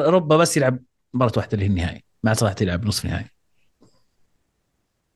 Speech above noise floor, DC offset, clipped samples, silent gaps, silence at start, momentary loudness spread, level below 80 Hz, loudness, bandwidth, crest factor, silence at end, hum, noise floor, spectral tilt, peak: 52 dB; under 0.1%; under 0.1%; none; 0 s; 14 LU; -48 dBFS; -21 LUFS; 12.5 kHz; 18 dB; 1.9 s; none; -72 dBFS; -5.5 dB/octave; -4 dBFS